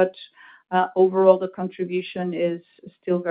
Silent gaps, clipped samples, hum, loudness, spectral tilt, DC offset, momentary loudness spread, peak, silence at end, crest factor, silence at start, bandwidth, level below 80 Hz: none; under 0.1%; none; -22 LUFS; -11 dB/octave; under 0.1%; 12 LU; -2 dBFS; 0 s; 20 dB; 0 s; 4.8 kHz; -74 dBFS